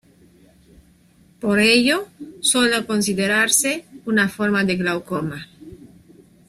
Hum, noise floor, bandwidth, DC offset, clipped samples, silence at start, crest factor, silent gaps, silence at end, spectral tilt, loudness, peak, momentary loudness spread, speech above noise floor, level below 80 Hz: none; -54 dBFS; 15.5 kHz; under 0.1%; under 0.1%; 1.4 s; 20 dB; none; 0.75 s; -3 dB/octave; -19 LUFS; -2 dBFS; 13 LU; 35 dB; -58 dBFS